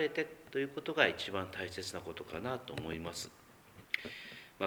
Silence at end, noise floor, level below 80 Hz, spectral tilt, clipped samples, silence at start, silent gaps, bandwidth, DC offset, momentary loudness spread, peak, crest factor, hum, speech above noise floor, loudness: 0 s; -59 dBFS; -66 dBFS; -4 dB/octave; under 0.1%; 0 s; none; over 20 kHz; under 0.1%; 15 LU; -10 dBFS; 28 dB; none; 21 dB; -38 LUFS